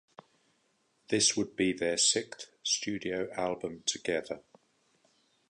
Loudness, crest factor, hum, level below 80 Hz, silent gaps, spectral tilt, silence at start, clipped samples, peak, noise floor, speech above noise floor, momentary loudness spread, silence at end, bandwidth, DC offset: -30 LUFS; 20 dB; none; -68 dBFS; none; -2 dB/octave; 1.1 s; under 0.1%; -14 dBFS; -73 dBFS; 42 dB; 10 LU; 1.1 s; 11 kHz; under 0.1%